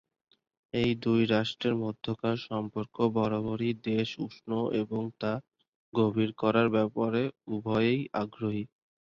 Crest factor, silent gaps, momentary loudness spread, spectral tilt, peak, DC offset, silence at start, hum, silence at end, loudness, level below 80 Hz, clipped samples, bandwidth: 20 dB; 5.68-5.92 s; 8 LU; -7.5 dB/octave; -10 dBFS; under 0.1%; 0.75 s; none; 0.45 s; -30 LUFS; -62 dBFS; under 0.1%; 7.2 kHz